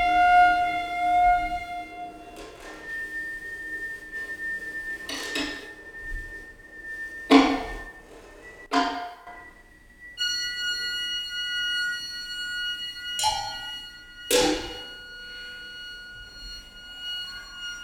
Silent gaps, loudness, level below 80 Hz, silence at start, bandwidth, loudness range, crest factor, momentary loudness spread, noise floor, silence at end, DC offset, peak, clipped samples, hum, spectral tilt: none; -26 LUFS; -48 dBFS; 0 s; 18.5 kHz; 7 LU; 26 dB; 21 LU; -52 dBFS; 0 s; under 0.1%; -2 dBFS; under 0.1%; none; -2 dB/octave